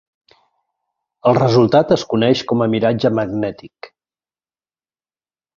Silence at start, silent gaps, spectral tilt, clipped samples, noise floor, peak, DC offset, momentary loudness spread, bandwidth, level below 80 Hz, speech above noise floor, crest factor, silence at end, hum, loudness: 1.25 s; none; -7 dB/octave; under 0.1%; under -90 dBFS; 0 dBFS; under 0.1%; 10 LU; 7.4 kHz; -54 dBFS; over 75 dB; 18 dB; 1.7 s; none; -16 LUFS